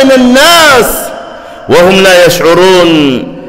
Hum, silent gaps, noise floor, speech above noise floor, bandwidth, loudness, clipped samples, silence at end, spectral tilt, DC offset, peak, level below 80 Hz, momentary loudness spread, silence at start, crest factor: none; none; -24 dBFS; 21 dB; 16.5 kHz; -4 LUFS; 0.9%; 0 s; -3.5 dB/octave; under 0.1%; 0 dBFS; -32 dBFS; 18 LU; 0 s; 4 dB